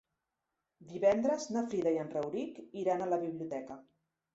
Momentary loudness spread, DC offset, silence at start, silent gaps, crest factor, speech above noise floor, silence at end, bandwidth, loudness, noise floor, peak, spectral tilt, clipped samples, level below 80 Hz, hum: 13 LU; under 0.1%; 0.8 s; none; 18 dB; 53 dB; 0.55 s; 8 kHz; -34 LUFS; -87 dBFS; -16 dBFS; -6 dB/octave; under 0.1%; -74 dBFS; none